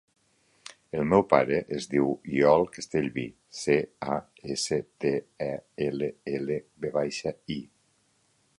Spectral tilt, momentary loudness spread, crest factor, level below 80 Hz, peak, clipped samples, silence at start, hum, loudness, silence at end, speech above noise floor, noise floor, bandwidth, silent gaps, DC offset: -5.5 dB/octave; 14 LU; 24 dB; -60 dBFS; -4 dBFS; under 0.1%; 0.95 s; none; -28 LUFS; 0.95 s; 41 dB; -69 dBFS; 11.5 kHz; none; under 0.1%